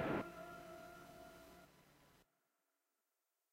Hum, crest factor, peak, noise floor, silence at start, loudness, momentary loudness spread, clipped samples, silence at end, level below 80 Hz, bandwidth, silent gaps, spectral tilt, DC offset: none; 24 dB; -28 dBFS; -90 dBFS; 0 s; -51 LUFS; 22 LU; under 0.1%; 1.3 s; -74 dBFS; 16 kHz; none; -6 dB/octave; under 0.1%